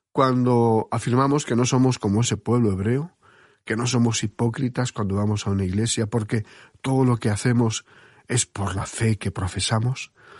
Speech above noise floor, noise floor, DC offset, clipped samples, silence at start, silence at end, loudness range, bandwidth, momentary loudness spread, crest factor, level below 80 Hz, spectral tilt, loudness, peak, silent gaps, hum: 33 dB; -55 dBFS; under 0.1%; under 0.1%; 0.15 s; 0 s; 3 LU; 11.5 kHz; 8 LU; 18 dB; -52 dBFS; -5.5 dB/octave; -23 LUFS; -4 dBFS; none; none